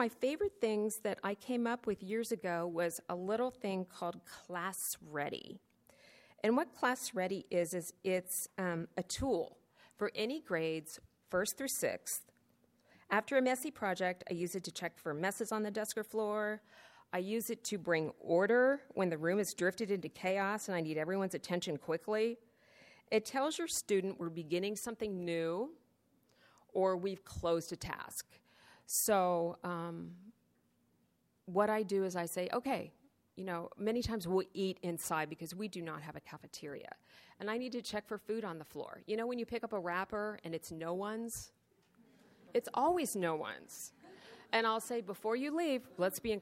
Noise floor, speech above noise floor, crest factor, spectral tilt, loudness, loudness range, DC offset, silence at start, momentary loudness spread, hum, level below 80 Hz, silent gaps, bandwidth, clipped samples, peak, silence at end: -76 dBFS; 39 dB; 20 dB; -4 dB/octave; -37 LUFS; 6 LU; under 0.1%; 0 s; 12 LU; none; -68 dBFS; none; 16 kHz; under 0.1%; -16 dBFS; 0 s